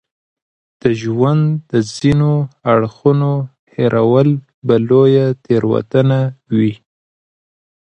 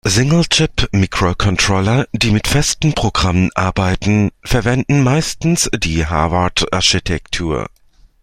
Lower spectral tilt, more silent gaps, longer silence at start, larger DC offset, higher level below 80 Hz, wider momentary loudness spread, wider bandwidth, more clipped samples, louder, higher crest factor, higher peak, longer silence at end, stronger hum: first, -8 dB/octave vs -4.5 dB/octave; first, 3.59-3.67 s, 4.54-4.62 s vs none; first, 0.85 s vs 0.05 s; neither; second, -50 dBFS vs -30 dBFS; about the same, 7 LU vs 5 LU; second, 8.8 kHz vs 15 kHz; neither; about the same, -15 LUFS vs -15 LUFS; about the same, 14 dB vs 14 dB; about the same, 0 dBFS vs 0 dBFS; first, 1.1 s vs 0.6 s; neither